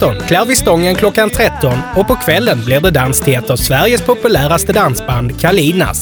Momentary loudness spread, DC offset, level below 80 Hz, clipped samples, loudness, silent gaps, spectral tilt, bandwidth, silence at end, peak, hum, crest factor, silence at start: 3 LU; under 0.1%; -28 dBFS; under 0.1%; -11 LUFS; none; -4.5 dB/octave; over 20 kHz; 0 s; 0 dBFS; none; 12 dB; 0 s